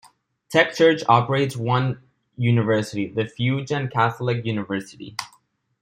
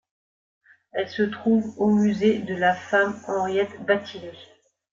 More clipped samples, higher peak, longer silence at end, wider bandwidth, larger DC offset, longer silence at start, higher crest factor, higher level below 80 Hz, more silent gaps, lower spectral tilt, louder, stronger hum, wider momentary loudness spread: neither; first, -2 dBFS vs -6 dBFS; about the same, 0.55 s vs 0.5 s; first, 15 kHz vs 7.6 kHz; neither; second, 0.5 s vs 0.95 s; about the same, 20 dB vs 18 dB; about the same, -62 dBFS vs -66 dBFS; neither; about the same, -6 dB/octave vs -6.5 dB/octave; about the same, -21 LUFS vs -23 LUFS; neither; first, 15 LU vs 11 LU